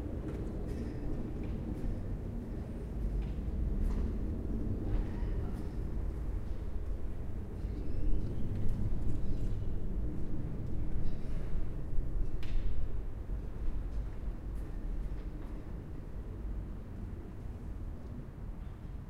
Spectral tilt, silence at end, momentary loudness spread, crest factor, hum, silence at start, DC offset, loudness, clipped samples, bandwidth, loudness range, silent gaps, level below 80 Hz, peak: -9 dB/octave; 0 s; 8 LU; 16 dB; none; 0 s; under 0.1%; -41 LUFS; under 0.1%; 4.2 kHz; 6 LU; none; -36 dBFS; -18 dBFS